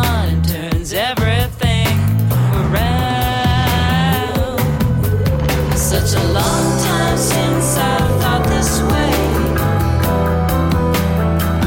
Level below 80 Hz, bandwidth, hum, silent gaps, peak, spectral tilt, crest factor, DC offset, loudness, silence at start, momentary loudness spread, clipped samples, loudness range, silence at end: -24 dBFS; 17 kHz; none; none; -4 dBFS; -5 dB/octave; 10 dB; under 0.1%; -15 LUFS; 0 s; 2 LU; under 0.1%; 1 LU; 0 s